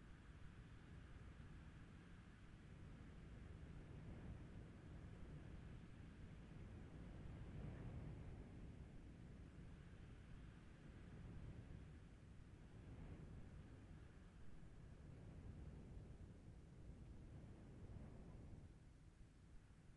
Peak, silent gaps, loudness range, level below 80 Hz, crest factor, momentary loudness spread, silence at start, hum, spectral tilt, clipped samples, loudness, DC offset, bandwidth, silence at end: -44 dBFS; none; 4 LU; -64 dBFS; 16 dB; 6 LU; 0 s; none; -7.5 dB/octave; under 0.1%; -61 LUFS; under 0.1%; 10.5 kHz; 0 s